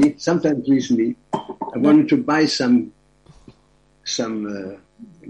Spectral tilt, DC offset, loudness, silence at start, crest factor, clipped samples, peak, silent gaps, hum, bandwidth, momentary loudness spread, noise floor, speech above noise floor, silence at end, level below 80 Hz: -5 dB/octave; under 0.1%; -19 LUFS; 0 s; 16 dB; under 0.1%; -4 dBFS; none; none; 9.4 kHz; 15 LU; -58 dBFS; 39 dB; 0 s; -58 dBFS